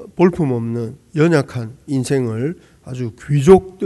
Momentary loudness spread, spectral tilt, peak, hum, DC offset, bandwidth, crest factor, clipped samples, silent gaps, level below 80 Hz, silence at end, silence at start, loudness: 16 LU; -7.5 dB/octave; 0 dBFS; none; under 0.1%; 12 kHz; 16 dB; 0.3%; none; -44 dBFS; 0 s; 0 s; -17 LUFS